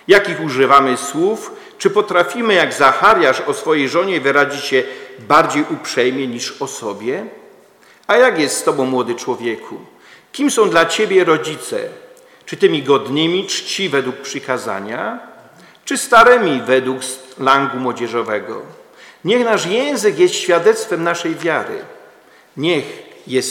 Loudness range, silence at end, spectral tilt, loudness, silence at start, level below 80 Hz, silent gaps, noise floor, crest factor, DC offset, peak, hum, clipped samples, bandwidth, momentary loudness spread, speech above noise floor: 4 LU; 0 s; -3.5 dB/octave; -15 LUFS; 0.1 s; -58 dBFS; none; -48 dBFS; 16 dB; under 0.1%; 0 dBFS; none; 0.2%; 17 kHz; 15 LU; 32 dB